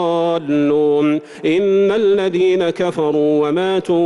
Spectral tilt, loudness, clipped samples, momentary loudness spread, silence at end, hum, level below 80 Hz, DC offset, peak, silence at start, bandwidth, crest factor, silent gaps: -7 dB/octave; -16 LUFS; under 0.1%; 4 LU; 0 s; none; -58 dBFS; under 0.1%; -8 dBFS; 0 s; 11 kHz; 8 dB; none